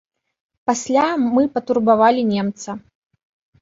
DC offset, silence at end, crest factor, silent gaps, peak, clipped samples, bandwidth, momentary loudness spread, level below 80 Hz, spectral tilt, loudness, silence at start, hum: under 0.1%; 0.85 s; 16 dB; none; -2 dBFS; under 0.1%; 8 kHz; 15 LU; -60 dBFS; -5 dB/octave; -18 LUFS; 0.7 s; none